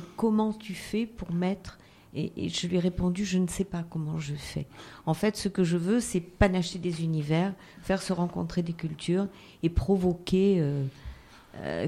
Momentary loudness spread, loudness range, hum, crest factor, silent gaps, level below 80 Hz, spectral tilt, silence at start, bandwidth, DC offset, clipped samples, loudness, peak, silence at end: 12 LU; 3 LU; none; 20 dB; none; -44 dBFS; -6 dB/octave; 0 s; 14 kHz; under 0.1%; under 0.1%; -29 LUFS; -8 dBFS; 0 s